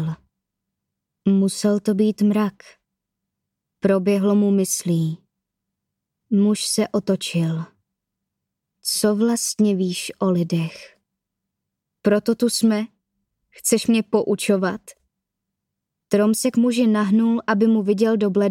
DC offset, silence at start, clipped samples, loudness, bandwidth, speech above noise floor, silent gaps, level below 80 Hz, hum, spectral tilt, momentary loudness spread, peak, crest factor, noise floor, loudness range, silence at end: under 0.1%; 0 s; under 0.1%; -20 LUFS; 16 kHz; 62 dB; none; -66 dBFS; none; -5.5 dB/octave; 8 LU; -4 dBFS; 16 dB; -81 dBFS; 3 LU; 0 s